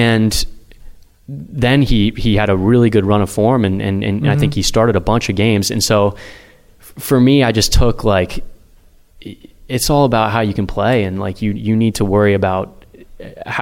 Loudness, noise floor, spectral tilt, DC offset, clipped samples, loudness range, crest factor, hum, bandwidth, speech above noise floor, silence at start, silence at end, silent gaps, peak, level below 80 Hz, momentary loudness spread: -15 LUFS; -46 dBFS; -5.5 dB/octave; under 0.1%; under 0.1%; 3 LU; 14 dB; none; 17 kHz; 32 dB; 0 s; 0 s; none; -2 dBFS; -28 dBFS; 15 LU